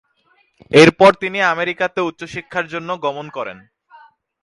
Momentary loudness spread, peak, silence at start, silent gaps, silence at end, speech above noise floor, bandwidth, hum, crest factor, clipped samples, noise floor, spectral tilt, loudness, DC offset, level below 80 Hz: 18 LU; 0 dBFS; 0.7 s; none; 0.9 s; 44 dB; 11.5 kHz; none; 18 dB; under 0.1%; -60 dBFS; -5 dB/octave; -15 LUFS; under 0.1%; -54 dBFS